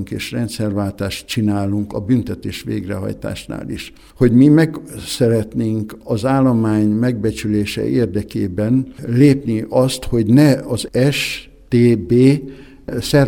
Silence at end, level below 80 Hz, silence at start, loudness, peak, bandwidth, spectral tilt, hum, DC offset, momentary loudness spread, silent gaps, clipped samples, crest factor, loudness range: 0 s; -40 dBFS; 0 s; -17 LUFS; 0 dBFS; 17.5 kHz; -6.5 dB/octave; none; under 0.1%; 14 LU; none; under 0.1%; 16 dB; 6 LU